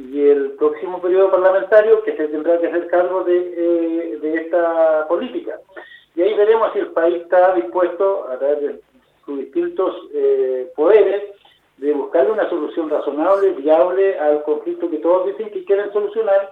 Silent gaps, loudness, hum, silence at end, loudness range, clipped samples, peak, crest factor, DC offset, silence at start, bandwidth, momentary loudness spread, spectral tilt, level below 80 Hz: none; -17 LUFS; none; 0 s; 3 LU; under 0.1%; 0 dBFS; 16 dB; under 0.1%; 0 s; 4.2 kHz; 10 LU; -7 dB/octave; -68 dBFS